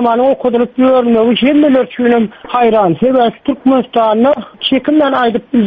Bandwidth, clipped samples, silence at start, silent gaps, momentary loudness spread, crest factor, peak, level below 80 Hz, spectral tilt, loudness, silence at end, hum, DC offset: 4.9 kHz; under 0.1%; 0 s; none; 4 LU; 10 dB; 0 dBFS; -48 dBFS; -8.5 dB/octave; -11 LUFS; 0 s; none; under 0.1%